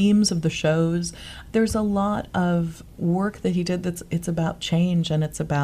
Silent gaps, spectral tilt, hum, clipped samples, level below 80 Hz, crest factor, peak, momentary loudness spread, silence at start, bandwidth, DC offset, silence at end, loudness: none; -6 dB/octave; none; under 0.1%; -44 dBFS; 14 dB; -8 dBFS; 6 LU; 0 s; 14.5 kHz; under 0.1%; 0 s; -24 LUFS